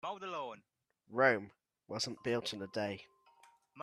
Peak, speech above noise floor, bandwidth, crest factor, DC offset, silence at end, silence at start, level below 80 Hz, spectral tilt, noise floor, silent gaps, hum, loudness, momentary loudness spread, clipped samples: -14 dBFS; 37 dB; 13 kHz; 24 dB; under 0.1%; 0 s; 0.05 s; -80 dBFS; -4 dB/octave; -73 dBFS; none; none; -37 LUFS; 17 LU; under 0.1%